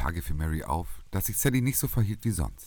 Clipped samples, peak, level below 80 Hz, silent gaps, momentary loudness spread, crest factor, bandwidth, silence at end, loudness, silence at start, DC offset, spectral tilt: under 0.1%; -10 dBFS; -36 dBFS; none; 8 LU; 18 dB; 19 kHz; 0 s; -29 LUFS; 0 s; under 0.1%; -5 dB/octave